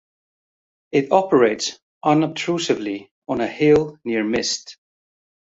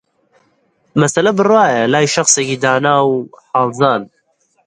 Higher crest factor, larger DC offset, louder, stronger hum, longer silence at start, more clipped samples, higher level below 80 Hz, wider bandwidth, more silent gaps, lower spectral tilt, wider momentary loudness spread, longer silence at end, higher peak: first, 20 dB vs 14 dB; neither; second, -20 LUFS vs -13 LUFS; neither; about the same, 0.95 s vs 0.95 s; neither; about the same, -58 dBFS vs -60 dBFS; second, 7.8 kHz vs 11.5 kHz; first, 1.82-2.01 s, 3.11-3.22 s vs none; about the same, -4.5 dB/octave vs -3.5 dB/octave; first, 11 LU vs 8 LU; first, 0.75 s vs 0.6 s; about the same, -2 dBFS vs 0 dBFS